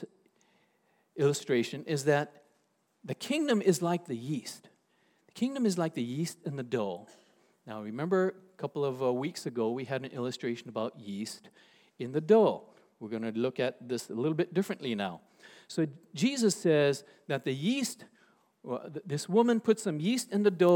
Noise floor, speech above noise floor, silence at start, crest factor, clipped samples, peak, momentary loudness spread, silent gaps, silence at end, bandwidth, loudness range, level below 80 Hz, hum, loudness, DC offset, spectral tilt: -74 dBFS; 43 dB; 0 s; 20 dB; under 0.1%; -12 dBFS; 15 LU; none; 0 s; 18 kHz; 4 LU; -88 dBFS; none; -31 LUFS; under 0.1%; -5.5 dB/octave